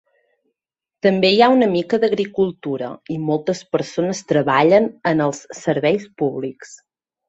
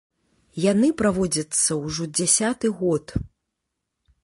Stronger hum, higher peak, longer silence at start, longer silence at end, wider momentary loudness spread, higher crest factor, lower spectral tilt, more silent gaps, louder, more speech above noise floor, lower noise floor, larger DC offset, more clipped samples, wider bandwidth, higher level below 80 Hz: neither; about the same, -2 dBFS vs -4 dBFS; first, 1.05 s vs 0.55 s; second, 0.55 s vs 0.95 s; about the same, 12 LU vs 13 LU; about the same, 18 dB vs 20 dB; first, -5.5 dB/octave vs -4 dB/octave; neither; first, -18 LUFS vs -22 LUFS; first, 69 dB vs 58 dB; first, -87 dBFS vs -80 dBFS; neither; neither; second, 8.2 kHz vs 11.5 kHz; second, -62 dBFS vs -46 dBFS